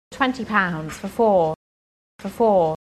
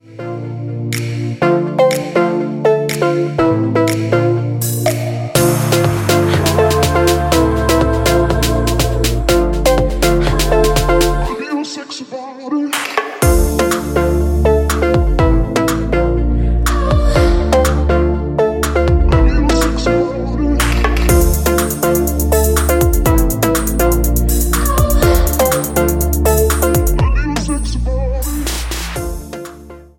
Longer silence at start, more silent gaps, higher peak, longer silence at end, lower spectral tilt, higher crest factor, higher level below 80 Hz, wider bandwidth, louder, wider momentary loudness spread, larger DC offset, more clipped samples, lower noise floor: about the same, 0.1 s vs 0.1 s; first, 1.56-2.19 s vs none; second, -4 dBFS vs 0 dBFS; about the same, 0.1 s vs 0.15 s; about the same, -6 dB/octave vs -5.5 dB/octave; about the same, 18 dB vs 14 dB; second, -52 dBFS vs -18 dBFS; second, 13.5 kHz vs 17 kHz; second, -21 LUFS vs -14 LUFS; first, 17 LU vs 7 LU; neither; neither; first, under -90 dBFS vs -35 dBFS